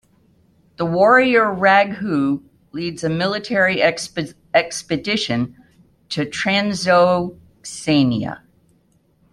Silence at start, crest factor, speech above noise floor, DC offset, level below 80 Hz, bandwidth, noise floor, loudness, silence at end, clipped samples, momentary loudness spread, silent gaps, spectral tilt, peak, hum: 0.8 s; 18 dB; 42 dB; under 0.1%; -56 dBFS; 13 kHz; -59 dBFS; -18 LUFS; 0.95 s; under 0.1%; 14 LU; none; -5 dB/octave; -2 dBFS; none